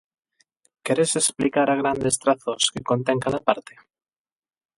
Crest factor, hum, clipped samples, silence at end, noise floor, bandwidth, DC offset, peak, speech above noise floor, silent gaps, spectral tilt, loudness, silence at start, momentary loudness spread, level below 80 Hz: 22 dB; none; under 0.1%; 1.15 s; -66 dBFS; 12 kHz; under 0.1%; -2 dBFS; 43 dB; none; -3.5 dB/octave; -22 LUFS; 0.85 s; 4 LU; -58 dBFS